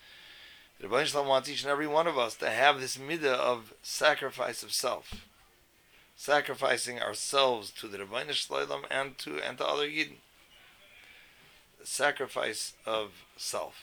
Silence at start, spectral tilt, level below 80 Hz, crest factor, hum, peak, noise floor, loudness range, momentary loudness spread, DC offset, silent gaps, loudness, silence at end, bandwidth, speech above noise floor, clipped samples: 0.05 s; -2 dB/octave; -66 dBFS; 24 dB; none; -8 dBFS; -63 dBFS; 6 LU; 14 LU; under 0.1%; none; -30 LUFS; 0 s; over 20 kHz; 32 dB; under 0.1%